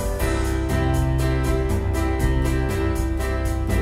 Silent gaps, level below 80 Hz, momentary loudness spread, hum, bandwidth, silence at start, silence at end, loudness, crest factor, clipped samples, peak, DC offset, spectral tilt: none; -24 dBFS; 3 LU; none; 16 kHz; 0 s; 0 s; -23 LUFS; 12 dB; under 0.1%; -8 dBFS; under 0.1%; -6.5 dB/octave